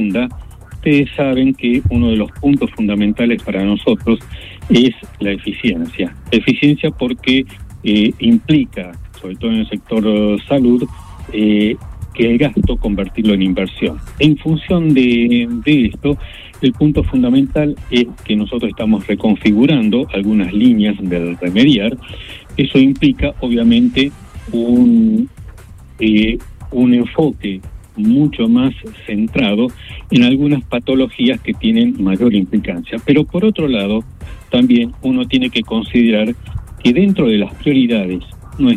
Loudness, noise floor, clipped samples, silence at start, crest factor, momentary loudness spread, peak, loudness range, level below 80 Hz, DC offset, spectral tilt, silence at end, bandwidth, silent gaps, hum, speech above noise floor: -14 LUFS; -35 dBFS; under 0.1%; 0 s; 14 dB; 11 LU; 0 dBFS; 2 LU; -32 dBFS; under 0.1%; -7.5 dB/octave; 0 s; 10 kHz; none; none; 22 dB